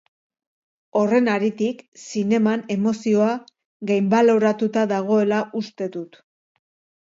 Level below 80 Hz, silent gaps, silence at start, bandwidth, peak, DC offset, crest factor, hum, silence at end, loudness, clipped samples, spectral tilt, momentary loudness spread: -70 dBFS; 1.88-1.92 s, 3.65-3.80 s; 0.95 s; 7.8 kHz; -4 dBFS; under 0.1%; 16 dB; none; 0.95 s; -21 LUFS; under 0.1%; -6.5 dB/octave; 13 LU